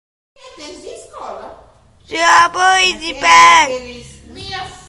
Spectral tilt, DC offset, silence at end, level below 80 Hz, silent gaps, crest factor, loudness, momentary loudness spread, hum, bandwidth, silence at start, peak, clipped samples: -0.5 dB/octave; under 0.1%; 0.15 s; -46 dBFS; none; 16 dB; -10 LUFS; 26 LU; none; 12.5 kHz; 0.6 s; 0 dBFS; 0.2%